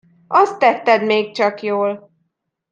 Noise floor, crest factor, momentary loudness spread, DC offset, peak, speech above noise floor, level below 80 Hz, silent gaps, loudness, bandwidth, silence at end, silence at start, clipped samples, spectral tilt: -71 dBFS; 18 dB; 7 LU; under 0.1%; 0 dBFS; 56 dB; -72 dBFS; none; -16 LUFS; 8.8 kHz; 0.75 s; 0.3 s; under 0.1%; -5 dB/octave